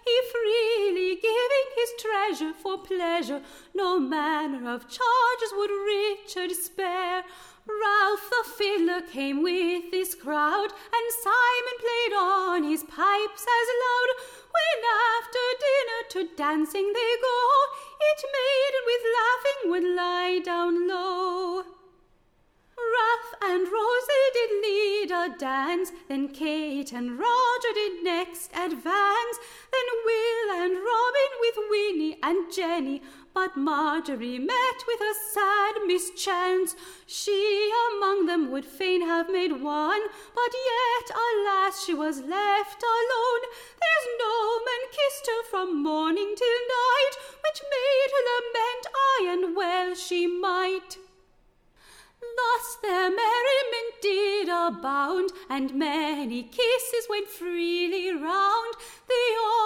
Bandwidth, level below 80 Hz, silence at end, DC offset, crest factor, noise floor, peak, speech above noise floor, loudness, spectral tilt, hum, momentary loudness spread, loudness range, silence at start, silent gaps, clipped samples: 17.5 kHz; -66 dBFS; 0 s; under 0.1%; 14 dB; -64 dBFS; -12 dBFS; 38 dB; -26 LUFS; -1.5 dB/octave; none; 8 LU; 3 LU; 0.05 s; none; under 0.1%